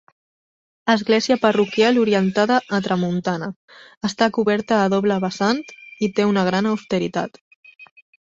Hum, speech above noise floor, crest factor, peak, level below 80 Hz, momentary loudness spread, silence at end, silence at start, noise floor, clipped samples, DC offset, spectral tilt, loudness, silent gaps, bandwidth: none; over 71 dB; 18 dB; -2 dBFS; -60 dBFS; 10 LU; 0.45 s; 0.85 s; under -90 dBFS; under 0.1%; under 0.1%; -5.5 dB/octave; -20 LUFS; 3.56-3.68 s, 3.97-4.01 s, 7.41-7.63 s; 7.8 kHz